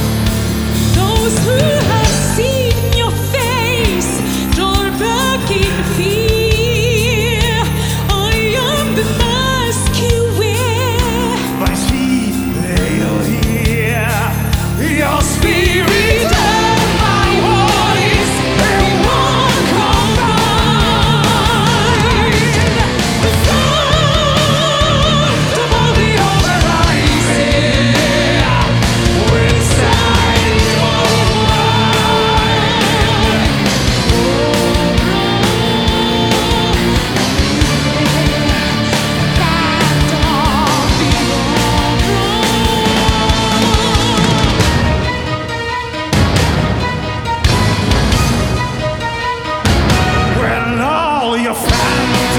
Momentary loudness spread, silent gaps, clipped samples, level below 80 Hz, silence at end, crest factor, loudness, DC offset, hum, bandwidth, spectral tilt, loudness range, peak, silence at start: 4 LU; none; under 0.1%; -22 dBFS; 0 s; 12 dB; -12 LUFS; under 0.1%; none; over 20 kHz; -4.5 dB/octave; 3 LU; 0 dBFS; 0 s